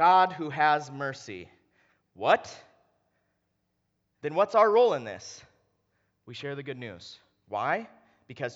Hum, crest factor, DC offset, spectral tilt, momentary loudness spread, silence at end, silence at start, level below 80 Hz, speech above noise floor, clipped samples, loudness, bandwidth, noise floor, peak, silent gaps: none; 22 dB; under 0.1%; -4.5 dB/octave; 23 LU; 0.05 s; 0 s; -80 dBFS; 50 dB; under 0.1%; -27 LUFS; 8 kHz; -77 dBFS; -6 dBFS; none